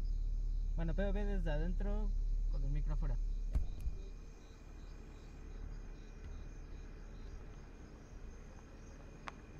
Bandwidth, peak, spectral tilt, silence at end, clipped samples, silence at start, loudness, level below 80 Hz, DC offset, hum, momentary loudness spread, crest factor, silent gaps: 6.8 kHz; -26 dBFS; -7.5 dB/octave; 0 s; under 0.1%; 0 s; -44 LUFS; -40 dBFS; under 0.1%; none; 16 LU; 14 dB; none